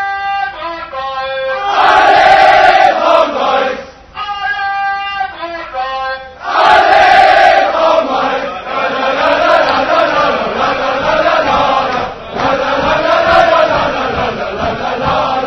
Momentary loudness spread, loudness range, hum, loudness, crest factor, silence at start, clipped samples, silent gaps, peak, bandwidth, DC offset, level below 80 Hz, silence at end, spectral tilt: 13 LU; 4 LU; none; -11 LUFS; 12 dB; 0 s; 0.6%; none; 0 dBFS; 11 kHz; under 0.1%; -38 dBFS; 0 s; -4 dB/octave